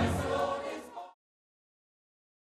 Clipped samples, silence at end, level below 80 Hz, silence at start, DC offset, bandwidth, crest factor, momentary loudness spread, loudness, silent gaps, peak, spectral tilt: under 0.1%; 1.35 s; -52 dBFS; 0 s; under 0.1%; 14 kHz; 18 dB; 17 LU; -34 LUFS; none; -18 dBFS; -6 dB/octave